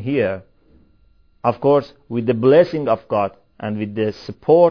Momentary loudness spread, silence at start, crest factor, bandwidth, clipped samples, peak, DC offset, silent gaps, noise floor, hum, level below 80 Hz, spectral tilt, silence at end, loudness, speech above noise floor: 14 LU; 0 s; 18 dB; 5.4 kHz; under 0.1%; -2 dBFS; 0.2%; none; -56 dBFS; none; -56 dBFS; -9 dB/octave; 0 s; -19 LUFS; 39 dB